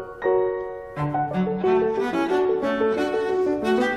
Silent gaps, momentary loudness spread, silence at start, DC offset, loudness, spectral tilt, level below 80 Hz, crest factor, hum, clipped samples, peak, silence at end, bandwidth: none; 5 LU; 0 s; under 0.1%; -23 LUFS; -7 dB/octave; -52 dBFS; 14 dB; none; under 0.1%; -10 dBFS; 0 s; 10.5 kHz